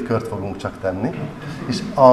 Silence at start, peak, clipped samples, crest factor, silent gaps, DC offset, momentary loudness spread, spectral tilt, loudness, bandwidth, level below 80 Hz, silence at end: 0 s; 0 dBFS; under 0.1%; 20 dB; none; 0.1%; 8 LU; -7 dB/octave; -23 LUFS; 13 kHz; -48 dBFS; 0 s